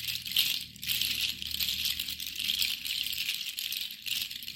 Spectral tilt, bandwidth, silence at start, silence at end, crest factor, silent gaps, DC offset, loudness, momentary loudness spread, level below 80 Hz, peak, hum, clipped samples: 1.5 dB/octave; 17 kHz; 0 s; 0 s; 24 dB; none; under 0.1%; -30 LUFS; 6 LU; -60 dBFS; -10 dBFS; none; under 0.1%